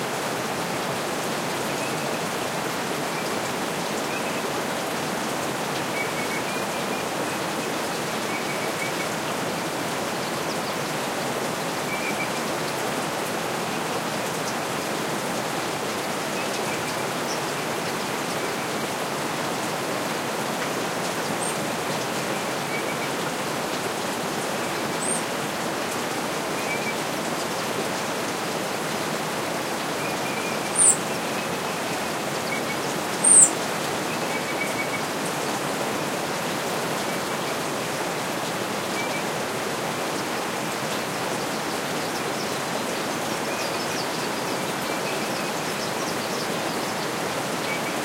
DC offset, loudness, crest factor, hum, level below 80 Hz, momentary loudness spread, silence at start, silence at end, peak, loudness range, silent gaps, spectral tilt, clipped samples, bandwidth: under 0.1%; -25 LUFS; 26 dB; none; -62 dBFS; 1 LU; 0 s; 0 s; 0 dBFS; 7 LU; none; -2.5 dB/octave; under 0.1%; 16 kHz